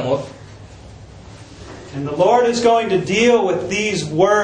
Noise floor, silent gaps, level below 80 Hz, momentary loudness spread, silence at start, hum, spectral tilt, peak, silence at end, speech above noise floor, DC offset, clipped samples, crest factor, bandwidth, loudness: -38 dBFS; none; -48 dBFS; 20 LU; 0 s; none; -4.5 dB/octave; -2 dBFS; 0 s; 23 dB; under 0.1%; under 0.1%; 16 dB; 9.8 kHz; -16 LUFS